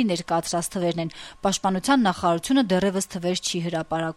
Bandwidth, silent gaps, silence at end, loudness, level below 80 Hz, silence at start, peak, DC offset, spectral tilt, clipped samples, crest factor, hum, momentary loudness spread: 15.5 kHz; none; 0.05 s; -24 LUFS; -54 dBFS; 0 s; -8 dBFS; under 0.1%; -4.5 dB/octave; under 0.1%; 16 dB; none; 7 LU